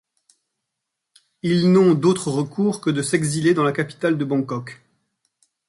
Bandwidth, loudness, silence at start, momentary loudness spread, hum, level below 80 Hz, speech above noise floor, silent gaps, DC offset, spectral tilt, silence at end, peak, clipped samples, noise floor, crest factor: 11.5 kHz; -20 LUFS; 1.45 s; 11 LU; none; -62 dBFS; 62 dB; none; under 0.1%; -6 dB/octave; 0.95 s; -4 dBFS; under 0.1%; -81 dBFS; 16 dB